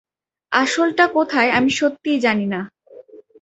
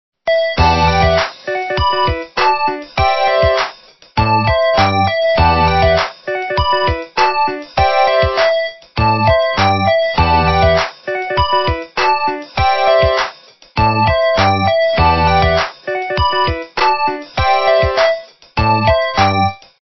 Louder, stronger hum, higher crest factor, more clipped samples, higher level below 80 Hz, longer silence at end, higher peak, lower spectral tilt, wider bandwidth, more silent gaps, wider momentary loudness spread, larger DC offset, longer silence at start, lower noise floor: second, -18 LUFS vs -14 LUFS; neither; about the same, 18 dB vs 14 dB; neither; second, -60 dBFS vs -26 dBFS; about the same, 0.25 s vs 0.15 s; about the same, -2 dBFS vs 0 dBFS; second, -4 dB/octave vs -6 dB/octave; first, 8.2 kHz vs 6.2 kHz; neither; about the same, 8 LU vs 7 LU; second, under 0.1% vs 0.9%; first, 0.5 s vs 0.25 s; first, -43 dBFS vs -37 dBFS